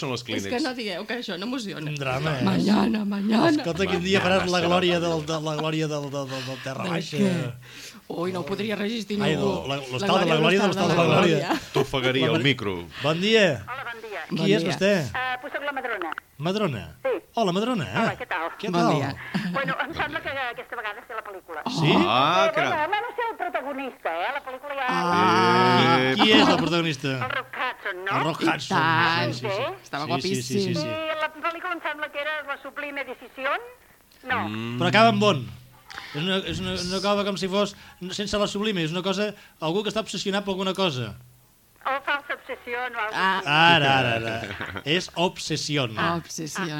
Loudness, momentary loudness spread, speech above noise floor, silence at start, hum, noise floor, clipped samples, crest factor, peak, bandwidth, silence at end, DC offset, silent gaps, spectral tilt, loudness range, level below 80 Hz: -24 LUFS; 13 LU; 32 dB; 0 s; none; -57 dBFS; under 0.1%; 20 dB; -4 dBFS; 17.5 kHz; 0 s; under 0.1%; none; -5 dB/octave; 7 LU; -56 dBFS